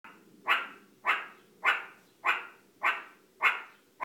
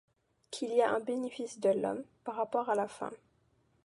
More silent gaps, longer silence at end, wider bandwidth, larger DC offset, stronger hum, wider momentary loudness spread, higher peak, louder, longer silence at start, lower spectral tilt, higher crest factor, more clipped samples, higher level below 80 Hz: neither; second, 0 s vs 0.7 s; first, 18 kHz vs 11.5 kHz; neither; neither; first, 18 LU vs 12 LU; first, -10 dBFS vs -16 dBFS; first, -31 LUFS vs -34 LUFS; second, 0.05 s vs 0.5 s; second, -0.5 dB/octave vs -4.5 dB/octave; about the same, 24 dB vs 20 dB; neither; second, -90 dBFS vs -80 dBFS